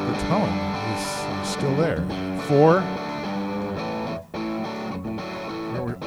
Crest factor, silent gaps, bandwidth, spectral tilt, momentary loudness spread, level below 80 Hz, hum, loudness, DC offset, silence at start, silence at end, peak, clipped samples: 20 dB; none; 19.5 kHz; -6 dB/octave; 13 LU; -48 dBFS; none; -25 LUFS; under 0.1%; 0 s; 0 s; -6 dBFS; under 0.1%